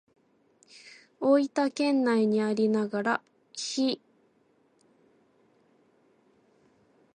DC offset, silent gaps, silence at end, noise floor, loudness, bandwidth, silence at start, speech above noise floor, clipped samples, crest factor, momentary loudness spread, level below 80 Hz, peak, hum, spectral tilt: under 0.1%; none; 3.2 s; -67 dBFS; -27 LUFS; 9.8 kHz; 0.85 s; 41 dB; under 0.1%; 18 dB; 14 LU; -80 dBFS; -12 dBFS; none; -5 dB/octave